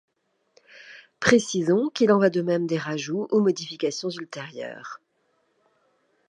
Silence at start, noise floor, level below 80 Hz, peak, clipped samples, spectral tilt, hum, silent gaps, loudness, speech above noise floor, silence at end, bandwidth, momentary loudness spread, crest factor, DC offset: 0.75 s; -70 dBFS; -64 dBFS; -2 dBFS; under 0.1%; -5 dB/octave; none; none; -23 LUFS; 47 dB; 1.3 s; 10.5 kHz; 19 LU; 24 dB; under 0.1%